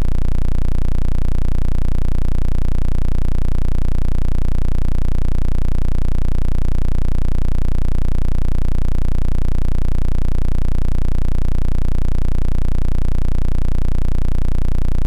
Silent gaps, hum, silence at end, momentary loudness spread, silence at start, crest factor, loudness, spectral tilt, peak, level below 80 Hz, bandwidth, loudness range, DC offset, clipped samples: none; none; 0 s; 0 LU; 0 s; 2 dB; -22 LUFS; -8 dB/octave; -10 dBFS; -14 dBFS; 2.8 kHz; 0 LU; under 0.1%; under 0.1%